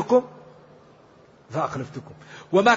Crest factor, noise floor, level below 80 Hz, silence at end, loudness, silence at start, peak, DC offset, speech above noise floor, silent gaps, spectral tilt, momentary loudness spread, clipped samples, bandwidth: 20 dB; -53 dBFS; -64 dBFS; 0 s; -25 LUFS; 0 s; -4 dBFS; under 0.1%; 31 dB; none; -5.5 dB/octave; 22 LU; under 0.1%; 8 kHz